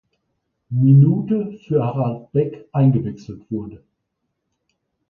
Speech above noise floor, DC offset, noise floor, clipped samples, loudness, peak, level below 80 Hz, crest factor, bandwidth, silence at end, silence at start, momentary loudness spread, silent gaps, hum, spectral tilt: 58 dB; under 0.1%; -75 dBFS; under 0.1%; -19 LUFS; -4 dBFS; -56 dBFS; 16 dB; 3.1 kHz; 1.35 s; 0.7 s; 16 LU; none; none; -11.5 dB/octave